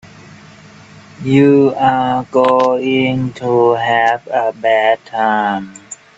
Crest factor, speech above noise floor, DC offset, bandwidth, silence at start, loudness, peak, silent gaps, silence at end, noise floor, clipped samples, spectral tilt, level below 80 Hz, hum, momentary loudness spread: 14 dB; 26 dB; under 0.1%; 8 kHz; 0.05 s; -13 LUFS; 0 dBFS; none; 0.25 s; -39 dBFS; under 0.1%; -6.5 dB/octave; -52 dBFS; none; 8 LU